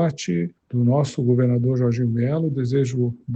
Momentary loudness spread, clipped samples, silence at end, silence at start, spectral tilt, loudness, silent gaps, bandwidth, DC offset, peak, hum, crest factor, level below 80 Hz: 6 LU; under 0.1%; 0 s; 0 s; -8 dB/octave; -21 LUFS; none; 8.2 kHz; under 0.1%; -8 dBFS; none; 14 dB; -56 dBFS